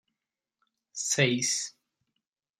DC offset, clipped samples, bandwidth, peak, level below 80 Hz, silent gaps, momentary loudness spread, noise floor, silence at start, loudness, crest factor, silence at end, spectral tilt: under 0.1%; under 0.1%; 14.5 kHz; -10 dBFS; -76 dBFS; none; 15 LU; -89 dBFS; 0.95 s; -27 LUFS; 24 dB; 0.9 s; -2.5 dB/octave